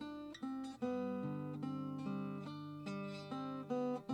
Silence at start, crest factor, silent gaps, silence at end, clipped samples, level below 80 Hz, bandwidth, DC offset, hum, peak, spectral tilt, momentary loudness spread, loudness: 0 s; 16 dB; none; 0 s; under 0.1%; -78 dBFS; 10.5 kHz; under 0.1%; none; -28 dBFS; -7.5 dB/octave; 7 LU; -44 LUFS